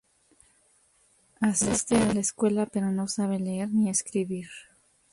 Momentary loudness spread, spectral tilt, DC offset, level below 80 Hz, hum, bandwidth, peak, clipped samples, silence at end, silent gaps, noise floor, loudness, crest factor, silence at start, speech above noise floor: 9 LU; -4.5 dB/octave; under 0.1%; -56 dBFS; none; 11.5 kHz; -10 dBFS; under 0.1%; 0.5 s; none; -65 dBFS; -27 LUFS; 18 dB; 1.4 s; 38 dB